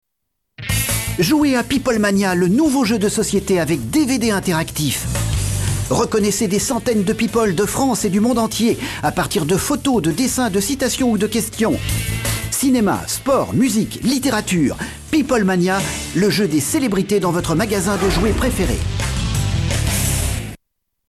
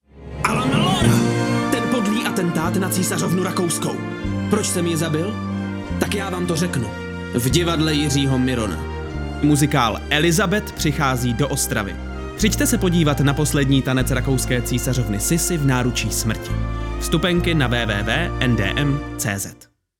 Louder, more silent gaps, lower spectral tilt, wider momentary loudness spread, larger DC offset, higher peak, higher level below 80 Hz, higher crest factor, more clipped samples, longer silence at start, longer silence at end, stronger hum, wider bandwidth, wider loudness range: about the same, -18 LUFS vs -20 LUFS; neither; about the same, -4.5 dB/octave vs -4.5 dB/octave; second, 5 LU vs 8 LU; neither; second, -6 dBFS vs -2 dBFS; about the same, -32 dBFS vs -32 dBFS; second, 12 dB vs 18 dB; neither; first, 0.6 s vs 0.15 s; about the same, 0.55 s vs 0.45 s; neither; second, 14 kHz vs 18 kHz; about the same, 2 LU vs 3 LU